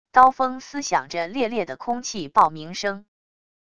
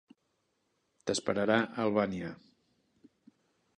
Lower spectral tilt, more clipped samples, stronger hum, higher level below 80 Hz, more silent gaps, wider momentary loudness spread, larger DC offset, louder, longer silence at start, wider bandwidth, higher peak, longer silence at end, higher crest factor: second, -3 dB/octave vs -4.5 dB/octave; neither; neither; first, -60 dBFS vs -68 dBFS; neither; about the same, 12 LU vs 14 LU; first, 0.4% vs under 0.1%; first, -22 LUFS vs -32 LUFS; second, 0.15 s vs 1.05 s; about the same, 10 kHz vs 11 kHz; first, -2 dBFS vs -12 dBFS; second, 0.8 s vs 1.45 s; about the same, 22 dB vs 24 dB